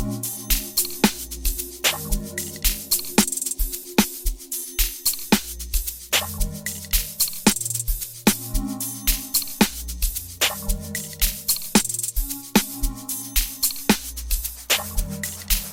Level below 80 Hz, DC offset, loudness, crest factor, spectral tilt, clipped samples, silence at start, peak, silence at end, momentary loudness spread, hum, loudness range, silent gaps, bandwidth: -30 dBFS; under 0.1%; -23 LUFS; 22 dB; -2.5 dB/octave; under 0.1%; 0 s; -2 dBFS; 0 s; 8 LU; none; 1 LU; none; 17 kHz